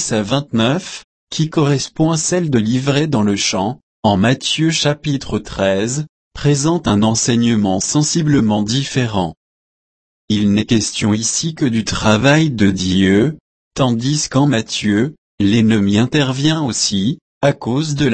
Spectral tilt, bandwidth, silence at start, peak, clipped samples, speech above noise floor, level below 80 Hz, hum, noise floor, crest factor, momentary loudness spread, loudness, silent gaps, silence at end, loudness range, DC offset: -4.5 dB/octave; 8.8 kHz; 0 s; 0 dBFS; under 0.1%; over 75 dB; -42 dBFS; none; under -90 dBFS; 16 dB; 8 LU; -16 LUFS; 1.04-1.27 s, 3.83-4.03 s, 6.09-6.31 s, 9.37-10.28 s, 13.40-13.71 s, 15.18-15.38 s, 17.21-17.41 s; 0 s; 2 LU; under 0.1%